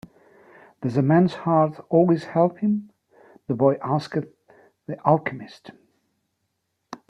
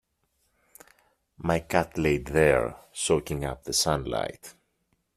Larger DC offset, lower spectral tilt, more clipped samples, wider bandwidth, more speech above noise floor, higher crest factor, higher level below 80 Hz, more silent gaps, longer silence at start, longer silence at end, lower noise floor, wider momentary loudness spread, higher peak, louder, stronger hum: neither; first, -9 dB/octave vs -4 dB/octave; neither; second, 10 kHz vs 15 kHz; first, 54 dB vs 48 dB; about the same, 20 dB vs 24 dB; second, -64 dBFS vs -46 dBFS; neither; second, 0.8 s vs 1.4 s; second, 0.15 s vs 0.65 s; about the same, -76 dBFS vs -74 dBFS; first, 21 LU vs 11 LU; about the same, -4 dBFS vs -6 dBFS; first, -22 LUFS vs -26 LUFS; neither